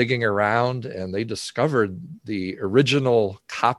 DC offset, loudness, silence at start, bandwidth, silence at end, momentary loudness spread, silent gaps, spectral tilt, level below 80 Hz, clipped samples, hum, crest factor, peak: under 0.1%; -22 LUFS; 0 s; 12 kHz; 0.05 s; 11 LU; none; -5.5 dB/octave; -54 dBFS; under 0.1%; none; 20 dB; -2 dBFS